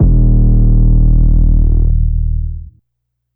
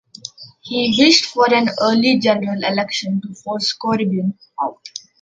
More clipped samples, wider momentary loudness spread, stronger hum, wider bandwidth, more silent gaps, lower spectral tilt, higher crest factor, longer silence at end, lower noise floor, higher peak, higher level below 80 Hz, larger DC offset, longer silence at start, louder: neither; second, 9 LU vs 21 LU; neither; second, 1.1 kHz vs 9.2 kHz; neither; first, -17.5 dB/octave vs -4 dB/octave; second, 10 dB vs 18 dB; first, 0.65 s vs 0.25 s; first, -71 dBFS vs -37 dBFS; about the same, 0 dBFS vs 0 dBFS; first, -10 dBFS vs -60 dBFS; neither; second, 0 s vs 0.25 s; first, -13 LUFS vs -17 LUFS